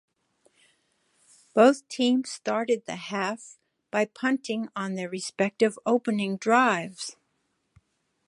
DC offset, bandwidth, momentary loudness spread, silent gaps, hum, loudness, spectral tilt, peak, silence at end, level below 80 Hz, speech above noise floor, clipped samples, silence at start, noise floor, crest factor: under 0.1%; 11.5 kHz; 12 LU; none; none; -26 LUFS; -4.5 dB/octave; -6 dBFS; 1.15 s; -78 dBFS; 49 dB; under 0.1%; 1.55 s; -75 dBFS; 22 dB